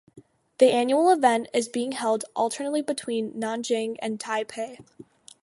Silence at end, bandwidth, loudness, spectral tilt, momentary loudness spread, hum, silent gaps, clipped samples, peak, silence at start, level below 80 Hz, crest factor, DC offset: 0.4 s; 11.5 kHz; -25 LUFS; -3.5 dB/octave; 11 LU; none; none; under 0.1%; -6 dBFS; 0.15 s; -76 dBFS; 20 dB; under 0.1%